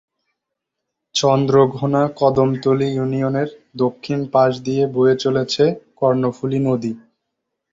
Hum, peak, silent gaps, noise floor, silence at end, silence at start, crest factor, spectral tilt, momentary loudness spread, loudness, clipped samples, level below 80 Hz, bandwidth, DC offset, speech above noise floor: none; -2 dBFS; none; -80 dBFS; 0.75 s; 1.15 s; 16 dB; -6.5 dB/octave; 8 LU; -18 LUFS; under 0.1%; -56 dBFS; 7.8 kHz; under 0.1%; 63 dB